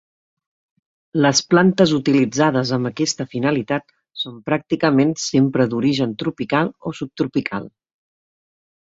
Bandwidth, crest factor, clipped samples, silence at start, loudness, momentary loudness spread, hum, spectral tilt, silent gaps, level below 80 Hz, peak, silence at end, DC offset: 7.8 kHz; 18 dB; under 0.1%; 1.15 s; -19 LUFS; 12 LU; none; -5 dB/octave; none; -58 dBFS; -2 dBFS; 1.3 s; under 0.1%